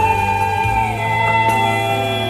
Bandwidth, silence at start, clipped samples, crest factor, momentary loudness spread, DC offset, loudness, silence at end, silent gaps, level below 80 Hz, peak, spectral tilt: 16 kHz; 0 s; under 0.1%; 14 dB; 3 LU; under 0.1%; -16 LUFS; 0 s; none; -36 dBFS; -4 dBFS; -5 dB/octave